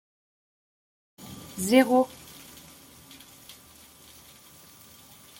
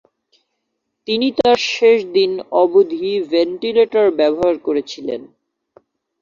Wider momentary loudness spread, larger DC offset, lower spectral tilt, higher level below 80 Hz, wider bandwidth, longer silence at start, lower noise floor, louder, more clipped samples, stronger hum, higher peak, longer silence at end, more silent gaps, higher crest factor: first, 28 LU vs 11 LU; neither; about the same, -4 dB/octave vs -4.5 dB/octave; second, -66 dBFS vs -58 dBFS; first, 17 kHz vs 7.4 kHz; about the same, 1.2 s vs 1.1 s; second, -52 dBFS vs -74 dBFS; second, -23 LUFS vs -16 LUFS; neither; neither; second, -8 dBFS vs -2 dBFS; first, 3.35 s vs 0.95 s; neither; first, 24 dB vs 16 dB